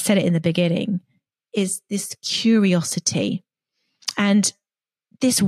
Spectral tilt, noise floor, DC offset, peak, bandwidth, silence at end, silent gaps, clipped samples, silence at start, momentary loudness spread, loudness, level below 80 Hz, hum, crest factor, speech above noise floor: -4.5 dB/octave; under -90 dBFS; under 0.1%; -4 dBFS; 14.5 kHz; 0 s; none; under 0.1%; 0 s; 10 LU; -21 LUFS; -68 dBFS; none; 16 dB; over 70 dB